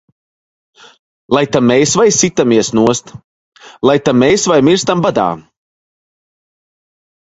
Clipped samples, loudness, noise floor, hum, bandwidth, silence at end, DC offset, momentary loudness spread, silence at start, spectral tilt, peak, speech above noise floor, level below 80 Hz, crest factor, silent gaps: under 0.1%; -12 LUFS; under -90 dBFS; none; 8.2 kHz; 1.9 s; under 0.1%; 6 LU; 1.3 s; -4 dB/octave; 0 dBFS; over 79 dB; -50 dBFS; 14 dB; 3.24-3.52 s